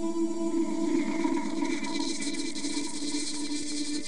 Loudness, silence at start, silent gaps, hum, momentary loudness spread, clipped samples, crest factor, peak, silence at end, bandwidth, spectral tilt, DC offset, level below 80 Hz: -31 LUFS; 0 s; none; none; 4 LU; under 0.1%; 16 dB; -16 dBFS; 0 s; 11 kHz; -3 dB/octave; 2%; -70 dBFS